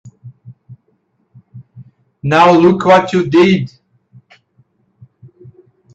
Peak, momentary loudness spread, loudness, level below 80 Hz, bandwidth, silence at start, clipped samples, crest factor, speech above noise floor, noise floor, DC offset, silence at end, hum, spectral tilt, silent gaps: 0 dBFS; 11 LU; -11 LUFS; -54 dBFS; 8 kHz; 0.05 s; under 0.1%; 16 dB; 52 dB; -61 dBFS; under 0.1%; 2.3 s; none; -7 dB/octave; none